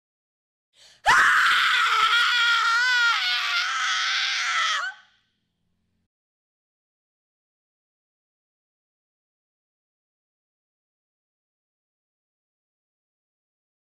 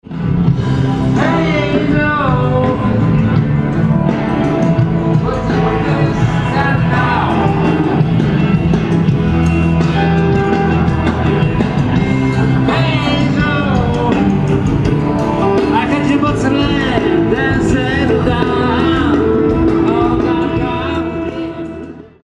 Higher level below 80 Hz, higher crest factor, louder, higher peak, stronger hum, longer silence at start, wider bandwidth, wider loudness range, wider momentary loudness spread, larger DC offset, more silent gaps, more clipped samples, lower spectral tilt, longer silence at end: second, -64 dBFS vs -28 dBFS; first, 18 dB vs 12 dB; second, -20 LUFS vs -13 LUFS; second, -8 dBFS vs 0 dBFS; neither; first, 1.05 s vs 0.05 s; first, 15.5 kHz vs 9.2 kHz; first, 10 LU vs 1 LU; first, 6 LU vs 2 LU; neither; neither; neither; second, 2 dB/octave vs -8 dB/octave; first, 8.85 s vs 0.25 s